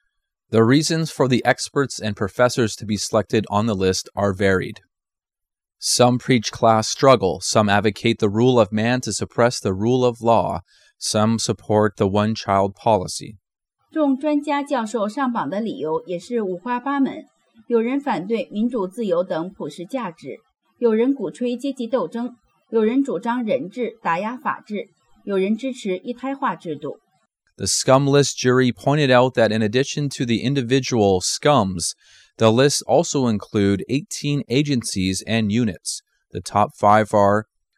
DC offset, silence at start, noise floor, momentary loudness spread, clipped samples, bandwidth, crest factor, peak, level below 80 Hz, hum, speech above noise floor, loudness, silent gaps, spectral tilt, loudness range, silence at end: under 0.1%; 0.5 s; -87 dBFS; 11 LU; under 0.1%; 14.5 kHz; 18 dB; -2 dBFS; -58 dBFS; none; 67 dB; -20 LUFS; none; -5 dB/octave; 6 LU; 0.35 s